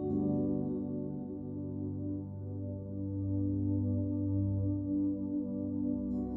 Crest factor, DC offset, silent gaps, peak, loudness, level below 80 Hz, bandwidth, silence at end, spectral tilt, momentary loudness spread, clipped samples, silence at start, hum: 12 dB; under 0.1%; none; -22 dBFS; -35 LUFS; -54 dBFS; 1.5 kHz; 0 s; -15.5 dB/octave; 8 LU; under 0.1%; 0 s; 50 Hz at -50 dBFS